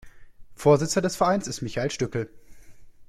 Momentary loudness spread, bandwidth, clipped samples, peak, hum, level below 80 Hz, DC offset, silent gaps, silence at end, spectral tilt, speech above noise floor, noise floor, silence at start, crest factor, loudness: 10 LU; 15 kHz; under 0.1%; -6 dBFS; none; -52 dBFS; under 0.1%; none; 0.05 s; -5 dB/octave; 21 dB; -44 dBFS; 0.05 s; 20 dB; -25 LUFS